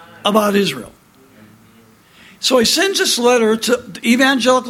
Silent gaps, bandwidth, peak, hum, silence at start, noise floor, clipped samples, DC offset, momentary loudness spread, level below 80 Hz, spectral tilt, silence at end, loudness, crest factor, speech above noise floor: none; 16.5 kHz; 0 dBFS; none; 0.25 s; -48 dBFS; under 0.1%; under 0.1%; 7 LU; -56 dBFS; -3 dB/octave; 0 s; -14 LUFS; 16 dB; 33 dB